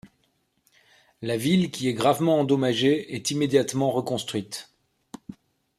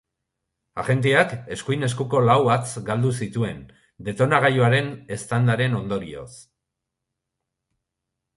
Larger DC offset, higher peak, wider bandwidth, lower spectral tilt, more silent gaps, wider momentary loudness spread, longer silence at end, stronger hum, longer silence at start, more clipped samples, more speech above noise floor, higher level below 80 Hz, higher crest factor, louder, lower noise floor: neither; second, -8 dBFS vs -2 dBFS; first, 15 kHz vs 11.5 kHz; about the same, -5 dB/octave vs -6 dB/octave; neither; about the same, 16 LU vs 16 LU; second, 0.45 s vs 1.95 s; neither; second, 0.05 s vs 0.75 s; neither; second, 46 dB vs 61 dB; second, -66 dBFS vs -56 dBFS; about the same, 18 dB vs 20 dB; about the same, -24 LUFS vs -22 LUFS; second, -70 dBFS vs -83 dBFS